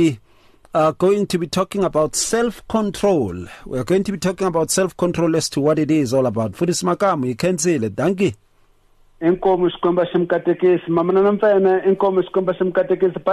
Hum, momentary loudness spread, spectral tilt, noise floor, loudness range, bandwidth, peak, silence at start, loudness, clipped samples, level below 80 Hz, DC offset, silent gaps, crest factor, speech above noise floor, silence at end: none; 5 LU; -5.5 dB/octave; -55 dBFS; 3 LU; 13.5 kHz; -8 dBFS; 0 s; -18 LUFS; under 0.1%; -48 dBFS; under 0.1%; none; 12 dB; 37 dB; 0 s